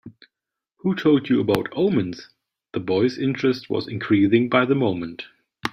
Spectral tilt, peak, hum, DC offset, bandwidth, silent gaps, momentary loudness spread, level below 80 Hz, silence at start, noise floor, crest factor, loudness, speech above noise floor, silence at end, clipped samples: -7.5 dB/octave; -2 dBFS; none; under 0.1%; 15.5 kHz; none; 14 LU; -60 dBFS; 0.05 s; -85 dBFS; 20 dB; -21 LUFS; 64 dB; 0 s; under 0.1%